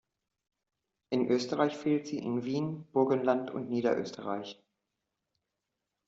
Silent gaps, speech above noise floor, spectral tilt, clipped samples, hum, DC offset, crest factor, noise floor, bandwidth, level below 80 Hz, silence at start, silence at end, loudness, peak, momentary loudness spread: none; 56 dB; -5.5 dB/octave; under 0.1%; none; under 0.1%; 20 dB; -86 dBFS; 7.6 kHz; -76 dBFS; 1.1 s; 1.55 s; -32 LUFS; -12 dBFS; 9 LU